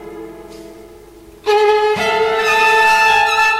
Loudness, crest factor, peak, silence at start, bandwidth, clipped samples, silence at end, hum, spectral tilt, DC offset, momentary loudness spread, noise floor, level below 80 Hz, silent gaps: -12 LUFS; 14 dB; -2 dBFS; 0 s; 16 kHz; under 0.1%; 0 s; none; -1.5 dB/octave; under 0.1%; 20 LU; -40 dBFS; -48 dBFS; none